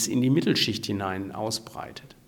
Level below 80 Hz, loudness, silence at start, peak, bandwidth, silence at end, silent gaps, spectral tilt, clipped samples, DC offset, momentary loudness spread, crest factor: -62 dBFS; -26 LUFS; 0 s; -10 dBFS; 19 kHz; 0.2 s; none; -4.5 dB/octave; under 0.1%; under 0.1%; 17 LU; 18 dB